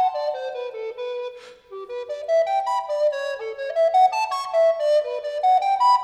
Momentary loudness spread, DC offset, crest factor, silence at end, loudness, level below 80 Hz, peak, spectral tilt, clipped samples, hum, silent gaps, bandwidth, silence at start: 14 LU; under 0.1%; 14 dB; 0 s; -22 LUFS; -72 dBFS; -8 dBFS; -0.5 dB/octave; under 0.1%; none; none; 12 kHz; 0 s